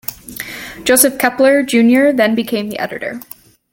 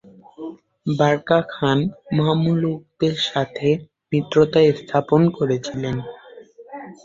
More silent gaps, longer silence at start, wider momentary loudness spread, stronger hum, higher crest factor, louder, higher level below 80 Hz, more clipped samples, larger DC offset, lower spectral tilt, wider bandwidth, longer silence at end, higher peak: neither; second, 0.1 s vs 0.4 s; second, 16 LU vs 19 LU; neither; about the same, 14 dB vs 18 dB; first, -13 LUFS vs -20 LUFS; about the same, -52 dBFS vs -54 dBFS; neither; neither; second, -3 dB/octave vs -7 dB/octave; first, 17 kHz vs 7.6 kHz; first, 0.5 s vs 0.1 s; about the same, 0 dBFS vs -2 dBFS